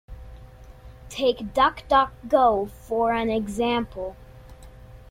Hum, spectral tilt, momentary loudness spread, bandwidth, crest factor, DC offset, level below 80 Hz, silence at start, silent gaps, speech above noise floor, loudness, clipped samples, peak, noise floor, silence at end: none; -5 dB/octave; 16 LU; 16.5 kHz; 18 dB; under 0.1%; -44 dBFS; 0.1 s; none; 22 dB; -23 LUFS; under 0.1%; -6 dBFS; -45 dBFS; 0.1 s